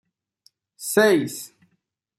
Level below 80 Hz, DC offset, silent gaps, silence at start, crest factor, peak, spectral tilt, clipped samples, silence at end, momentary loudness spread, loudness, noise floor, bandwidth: -72 dBFS; under 0.1%; none; 0.8 s; 20 dB; -6 dBFS; -4 dB/octave; under 0.1%; 0.7 s; 19 LU; -20 LUFS; -73 dBFS; 15 kHz